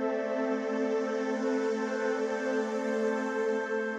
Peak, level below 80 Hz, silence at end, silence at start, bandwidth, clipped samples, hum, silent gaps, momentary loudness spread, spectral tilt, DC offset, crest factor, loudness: -18 dBFS; -78 dBFS; 0 s; 0 s; 9.4 kHz; under 0.1%; none; none; 1 LU; -5 dB/octave; under 0.1%; 12 dB; -31 LUFS